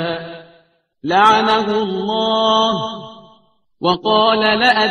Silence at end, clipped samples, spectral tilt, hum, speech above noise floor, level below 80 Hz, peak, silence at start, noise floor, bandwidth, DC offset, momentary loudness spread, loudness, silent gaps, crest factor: 0 s; under 0.1%; -4.5 dB/octave; none; 39 dB; -56 dBFS; 0 dBFS; 0 s; -54 dBFS; 11 kHz; under 0.1%; 15 LU; -15 LUFS; none; 16 dB